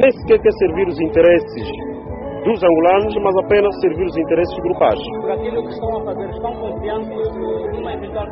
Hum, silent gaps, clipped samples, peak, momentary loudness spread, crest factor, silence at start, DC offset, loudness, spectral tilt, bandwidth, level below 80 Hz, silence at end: none; none; under 0.1%; -2 dBFS; 12 LU; 14 dB; 0 s; under 0.1%; -17 LUFS; -5 dB/octave; 5.8 kHz; -38 dBFS; 0 s